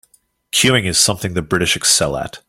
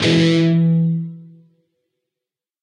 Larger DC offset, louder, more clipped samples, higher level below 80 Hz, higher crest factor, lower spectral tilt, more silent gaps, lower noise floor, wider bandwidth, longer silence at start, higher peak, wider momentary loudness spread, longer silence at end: neither; about the same, -15 LUFS vs -16 LUFS; neither; first, -44 dBFS vs -58 dBFS; about the same, 18 dB vs 14 dB; second, -2.5 dB/octave vs -6.5 dB/octave; neither; second, -56 dBFS vs -86 dBFS; first, 16.5 kHz vs 9.8 kHz; first, 0.55 s vs 0 s; first, 0 dBFS vs -6 dBFS; second, 7 LU vs 11 LU; second, 0.1 s vs 1.4 s